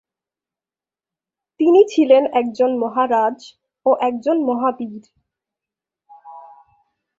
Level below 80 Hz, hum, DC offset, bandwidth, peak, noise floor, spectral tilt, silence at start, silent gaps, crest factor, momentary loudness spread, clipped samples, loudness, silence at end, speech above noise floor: -70 dBFS; none; under 0.1%; 7.6 kHz; -2 dBFS; under -90 dBFS; -5.5 dB/octave; 1.6 s; none; 18 dB; 10 LU; under 0.1%; -17 LUFS; 0.8 s; over 74 dB